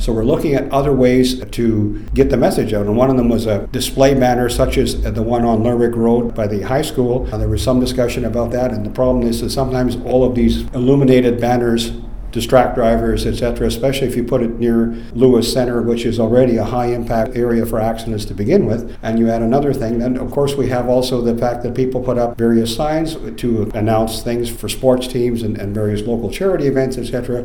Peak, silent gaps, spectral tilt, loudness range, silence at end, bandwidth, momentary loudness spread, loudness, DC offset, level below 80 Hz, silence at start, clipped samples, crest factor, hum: 0 dBFS; none; -6.5 dB/octave; 3 LU; 0 s; 19 kHz; 7 LU; -16 LUFS; 2%; -28 dBFS; 0 s; under 0.1%; 16 dB; none